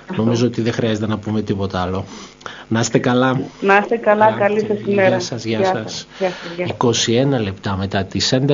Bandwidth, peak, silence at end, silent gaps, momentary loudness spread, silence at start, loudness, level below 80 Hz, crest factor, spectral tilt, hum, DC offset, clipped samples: 7.6 kHz; 0 dBFS; 0 s; none; 9 LU; 0 s; -18 LUFS; -52 dBFS; 18 dB; -4.5 dB/octave; none; under 0.1%; under 0.1%